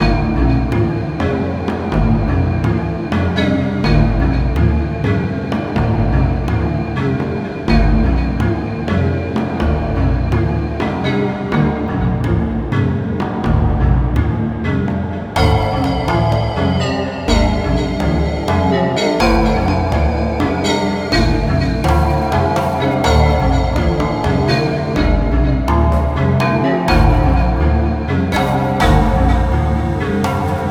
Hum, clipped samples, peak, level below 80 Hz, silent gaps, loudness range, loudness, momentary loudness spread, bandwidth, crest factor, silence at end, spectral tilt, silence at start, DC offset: none; under 0.1%; 0 dBFS; -20 dBFS; none; 3 LU; -16 LUFS; 5 LU; 13.5 kHz; 14 dB; 0 s; -7 dB/octave; 0 s; under 0.1%